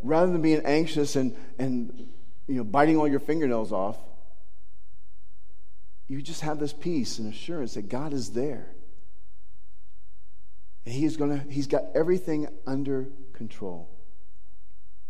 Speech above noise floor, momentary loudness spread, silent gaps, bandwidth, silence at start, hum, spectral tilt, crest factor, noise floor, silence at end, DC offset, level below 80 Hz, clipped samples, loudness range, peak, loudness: 32 dB; 17 LU; none; 14.5 kHz; 0.05 s; none; -6 dB/octave; 22 dB; -60 dBFS; 1.25 s; 5%; -60 dBFS; under 0.1%; 10 LU; -6 dBFS; -28 LUFS